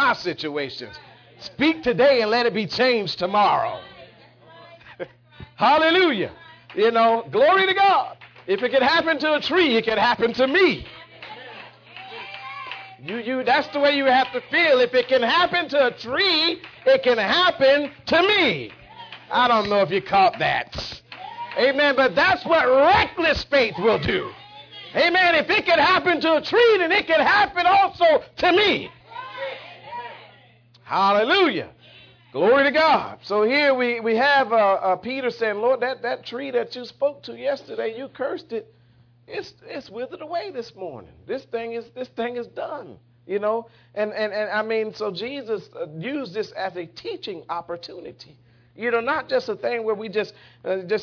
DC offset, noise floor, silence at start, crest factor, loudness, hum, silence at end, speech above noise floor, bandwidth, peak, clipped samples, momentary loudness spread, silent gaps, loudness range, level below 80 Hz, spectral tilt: under 0.1%; -55 dBFS; 0 s; 14 dB; -20 LUFS; none; 0 s; 35 dB; 5.4 kHz; -8 dBFS; under 0.1%; 19 LU; none; 11 LU; -54 dBFS; -5 dB/octave